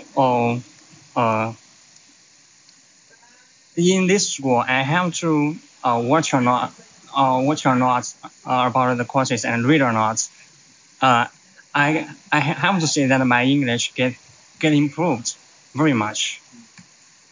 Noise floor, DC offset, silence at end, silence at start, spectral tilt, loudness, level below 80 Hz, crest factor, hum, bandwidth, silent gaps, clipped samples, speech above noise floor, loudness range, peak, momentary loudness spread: -52 dBFS; under 0.1%; 0.5 s; 0 s; -4.5 dB/octave; -19 LUFS; -66 dBFS; 18 dB; none; 7.6 kHz; none; under 0.1%; 33 dB; 5 LU; -4 dBFS; 10 LU